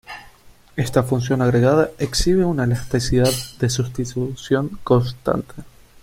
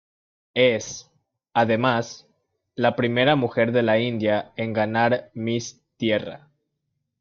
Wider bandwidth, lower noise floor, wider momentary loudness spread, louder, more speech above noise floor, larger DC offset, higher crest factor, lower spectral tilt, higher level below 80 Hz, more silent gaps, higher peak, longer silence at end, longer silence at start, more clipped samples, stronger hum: first, 16.5 kHz vs 7.6 kHz; second, -47 dBFS vs -77 dBFS; second, 9 LU vs 16 LU; about the same, -20 LUFS vs -22 LUFS; second, 28 dB vs 56 dB; neither; about the same, 18 dB vs 18 dB; about the same, -6 dB/octave vs -5.5 dB/octave; first, -36 dBFS vs -64 dBFS; neither; first, -2 dBFS vs -6 dBFS; second, 0.4 s vs 0.85 s; second, 0.1 s vs 0.55 s; neither; neither